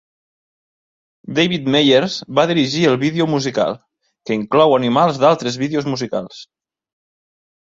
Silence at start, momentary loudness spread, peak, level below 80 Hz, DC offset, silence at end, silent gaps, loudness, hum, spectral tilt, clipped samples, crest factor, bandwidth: 1.25 s; 10 LU; 0 dBFS; -58 dBFS; under 0.1%; 1.2 s; none; -16 LUFS; none; -5.5 dB/octave; under 0.1%; 16 dB; 7.8 kHz